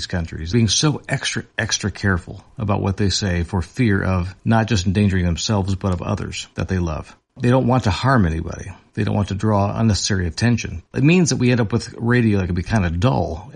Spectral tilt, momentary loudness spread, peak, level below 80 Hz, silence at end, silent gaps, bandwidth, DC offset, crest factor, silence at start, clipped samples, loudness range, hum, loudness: -5.5 dB/octave; 9 LU; -4 dBFS; -40 dBFS; 0.05 s; none; 10.5 kHz; under 0.1%; 16 dB; 0 s; under 0.1%; 2 LU; none; -19 LUFS